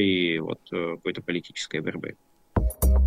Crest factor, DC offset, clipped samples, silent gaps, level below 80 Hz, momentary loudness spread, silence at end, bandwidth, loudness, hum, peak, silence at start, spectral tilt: 16 dB; under 0.1%; under 0.1%; none; -30 dBFS; 9 LU; 0 s; 16 kHz; -28 LUFS; none; -10 dBFS; 0 s; -5.5 dB/octave